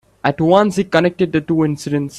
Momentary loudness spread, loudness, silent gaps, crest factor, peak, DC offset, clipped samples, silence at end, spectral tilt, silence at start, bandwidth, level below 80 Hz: 6 LU; -16 LUFS; none; 16 dB; 0 dBFS; under 0.1%; under 0.1%; 0 s; -6.5 dB/octave; 0.25 s; 13 kHz; -50 dBFS